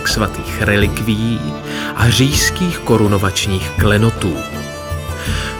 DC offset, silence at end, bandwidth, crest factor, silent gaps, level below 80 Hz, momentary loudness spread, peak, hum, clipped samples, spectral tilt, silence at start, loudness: under 0.1%; 0 s; 19.5 kHz; 16 dB; none; -28 dBFS; 10 LU; 0 dBFS; none; under 0.1%; -4.5 dB/octave; 0 s; -16 LUFS